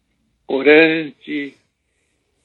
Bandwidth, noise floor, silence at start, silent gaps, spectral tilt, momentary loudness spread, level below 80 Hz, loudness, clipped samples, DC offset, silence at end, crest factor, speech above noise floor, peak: 4.4 kHz; -68 dBFS; 0.5 s; none; -7.5 dB/octave; 16 LU; -72 dBFS; -15 LUFS; under 0.1%; under 0.1%; 0.95 s; 18 dB; 53 dB; 0 dBFS